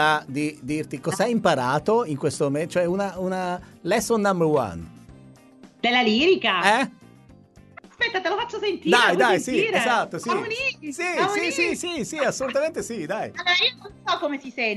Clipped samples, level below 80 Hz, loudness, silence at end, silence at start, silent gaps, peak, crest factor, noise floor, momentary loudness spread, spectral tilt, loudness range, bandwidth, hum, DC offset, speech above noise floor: under 0.1%; -58 dBFS; -23 LUFS; 0 s; 0 s; none; -2 dBFS; 22 dB; -50 dBFS; 10 LU; -4 dB/octave; 3 LU; 12 kHz; none; under 0.1%; 28 dB